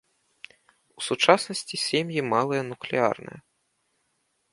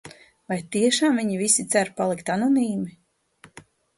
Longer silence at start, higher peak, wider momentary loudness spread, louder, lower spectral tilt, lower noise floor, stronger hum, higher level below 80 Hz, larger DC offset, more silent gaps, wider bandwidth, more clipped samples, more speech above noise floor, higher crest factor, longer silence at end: first, 1 s vs 0.05 s; first, 0 dBFS vs -6 dBFS; about the same, 13 LU vs 12 LU; second, -25 LUFS vs -22 LUFS; about the same, -3.5 dB/octave vs -3.5 dB/octave; first, -73 dBFS vs -55 dBFS; neither; second, -72 dBFS vs -66 dBFS; neither; neither; about the same, 11.5 kHz vs 12 kHz; neither; first, 48 dB vs 32 dB; first, 26 dB vs 18 dB; about the same, 1.15 s vs 1.1 s